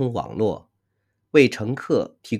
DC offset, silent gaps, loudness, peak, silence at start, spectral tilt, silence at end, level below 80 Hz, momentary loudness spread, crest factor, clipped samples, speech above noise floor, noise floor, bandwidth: under 0.1%; none; -22 LUFS; 0 dBFS; 0 s; -6.5 dB/octave; 0 s; -58 dBFS; 10 LU; 22 dB; under 0.1%; 52 dB; -74 dBFS; 12.5 kHz